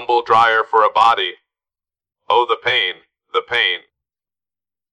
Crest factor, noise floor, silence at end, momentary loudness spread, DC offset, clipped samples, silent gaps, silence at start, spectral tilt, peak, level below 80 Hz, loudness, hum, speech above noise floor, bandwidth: 16 dB; under -90 dBFS; 1.15 s; 10 LU; under 0.1%; under 0.1%; none; 0 s; -3 dB/octave; -2 dBFS; -60 dBFS; -16 LUFS; none; over 74 dB; 11 kHz